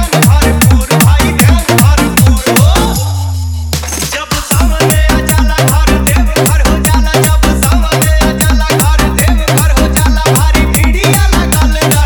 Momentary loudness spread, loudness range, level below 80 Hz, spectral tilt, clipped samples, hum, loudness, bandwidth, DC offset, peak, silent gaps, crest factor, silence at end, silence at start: 6 LU; 2 LU; -12 dBFS; -4.5 dB/octave; 0.7%; none; -9 LUFS; over 20 kHz; under 0.1%; 0 dBFS; none; 8 dB; 0 s; 0 s